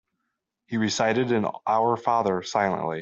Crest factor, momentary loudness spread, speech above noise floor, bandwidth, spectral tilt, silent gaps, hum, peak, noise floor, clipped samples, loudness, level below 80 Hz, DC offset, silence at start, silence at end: 16 dB; 3 LU; 56 dB; 8 kHz; -5 dB/octave; none; none; -8 dBFS; -80 dBFS; under 0.1%; -24 LUFS; -66 dBFS; under 0.1%; 0.7 s; 0 s